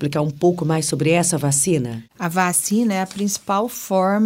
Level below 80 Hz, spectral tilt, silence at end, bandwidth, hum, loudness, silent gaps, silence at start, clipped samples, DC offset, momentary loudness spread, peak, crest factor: -56 dBFS; -4.5 dB/octave; 0 s; 16.5 kHz; none; -19 LUFS; none; 0 s; under 0.1%; under 0.1%; 6 LU; -4 dBFS; 16 dB